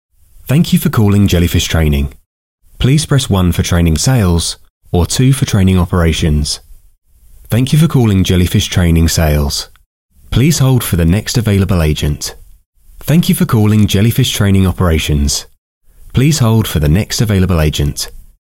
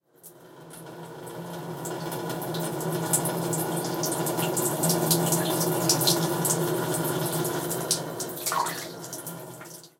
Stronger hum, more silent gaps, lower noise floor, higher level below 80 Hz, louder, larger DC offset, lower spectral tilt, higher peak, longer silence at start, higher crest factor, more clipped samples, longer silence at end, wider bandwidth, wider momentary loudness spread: neither; first, 2.26-2.58 s, 4.70-4.81 s, 9.86-10.09 s, 12.66-12.73 s, 15.58-15.81 s vs none; second, -37 dBFS vs -51 dBFS; first, -24 dBFS vs -66 dBFS; first, -12 LUFS vs -26 LUFS; first, 0.3% vs under 0.1%; first, -5.5 dB/octave vs -3.5 dB/octave; first, 0 dBFS vs -6 dBFS; first, 0.45 s vs 0.25 s; second, 12 dB vs 22 dB; neither; about the same, 0.2 s vs 0.1 s; about the same, 16.5 kHz vs 17 kHz; second, 8 LU vs 17 LU